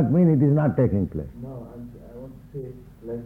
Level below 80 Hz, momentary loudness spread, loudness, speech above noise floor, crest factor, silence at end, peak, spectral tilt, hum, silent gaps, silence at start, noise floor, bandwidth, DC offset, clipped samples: -46 dBFS; 23 LU; -21 LUFS; 19 dB; 14 dB; 0 s; -8 dBFS; -12 dB/octave; none; none; 0 s; -41 dBFS; 2.9 kHz; under 0.1%; under 0.1%